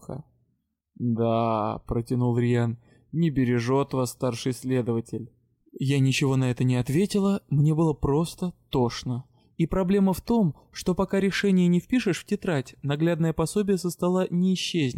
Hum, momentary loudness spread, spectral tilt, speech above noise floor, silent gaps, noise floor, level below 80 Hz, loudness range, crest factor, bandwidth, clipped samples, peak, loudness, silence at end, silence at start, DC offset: none; 8 LU; -6.5 dB/octave; 51 dB; none; -75 dBFS; -48 dBFS; 2 LU; 12 dB; 16.5 kHz; under 0.1%; -14 dBFS; -25 LUFS; 0 s; 0.1 s; under 0.1%